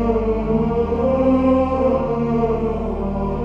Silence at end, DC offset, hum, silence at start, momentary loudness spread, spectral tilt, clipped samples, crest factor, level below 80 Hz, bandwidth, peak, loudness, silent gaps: 0 s; under 0.1%; none; 0 s; 7 LU; -10 dB/octave; under 0.1%; 14 dB; -30 dBFS; 6.8 kHz; -6 dBFS; -19 LUFS; none